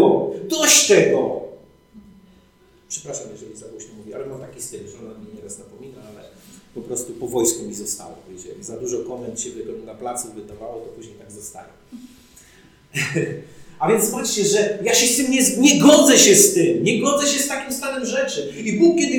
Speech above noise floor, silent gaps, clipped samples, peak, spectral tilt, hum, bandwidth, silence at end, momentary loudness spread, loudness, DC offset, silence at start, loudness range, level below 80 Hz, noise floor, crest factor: 34 dB; none; under 0.1%; -2 dBFS; -2.5 dB/octave; none; 19 kHz; 0 s; 26 LU; -17 LUFS; under 0.1%; 0 s; 21 LU; -58 dBFS; -54 dBFS; 18 dB